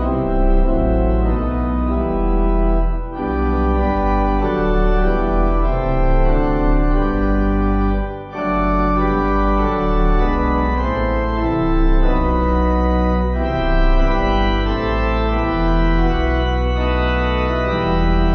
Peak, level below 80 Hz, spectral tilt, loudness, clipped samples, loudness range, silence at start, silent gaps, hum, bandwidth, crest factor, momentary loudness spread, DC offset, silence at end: -4 dBFS; -18 dBFS; -9 dB/octave; -18 LUFS; under 0.1%; 1 LU; 0 s; none; none; 6.2 kHz; 12 dB; 2 LU; under 0.1%; 0 s